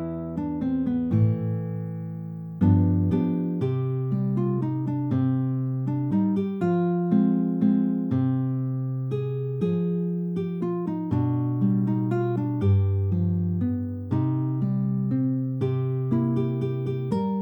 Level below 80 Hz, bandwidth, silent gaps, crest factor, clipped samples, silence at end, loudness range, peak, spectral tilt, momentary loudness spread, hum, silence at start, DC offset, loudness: -58 dBFS; 4.1 kHz; none; 16 dB; under 0.1%; 0 s; 2 LU; -10 dBFS; -11.5 dB/octave; 6 LU; none; 0 s; under 0.1%; -25 LUFS